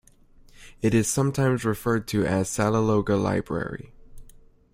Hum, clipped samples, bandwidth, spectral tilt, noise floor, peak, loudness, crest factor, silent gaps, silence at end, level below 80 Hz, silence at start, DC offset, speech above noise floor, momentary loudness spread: none; under 0.1%; 16 kHz; -6 dB/octave; -53 dBFS; -6 dBFS; -24 LUFS; 18 dB; none; 0.45 s; -48 dBFS; 0.6 s; under 0.1%; 30 dB; 8 LU